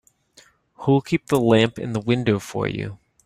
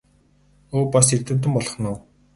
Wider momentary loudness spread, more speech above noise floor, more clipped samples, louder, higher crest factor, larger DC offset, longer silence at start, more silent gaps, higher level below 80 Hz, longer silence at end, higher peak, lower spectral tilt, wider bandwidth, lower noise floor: about the same, 10 LU vs 12 LU; about the same, 35 dB vs 38 dB; neither; about the same, -21 LUFS vs -20 LUFS; about the same, 18 dB vs 22 dB; neither; about the same, 0.8 s vs 0.7 s; neither; about the same, -54 dBFS vs -50 dBFS; about the same, 0.3 s vs 0.35 s; about the same, -4 dBFS vs -2 dBFS; first, -6.5 dB/octave vs -5 dB/octave; first, 15.5 kHz vs 11.5 kHz; about the same, -55 dBFS vs -58 dBFS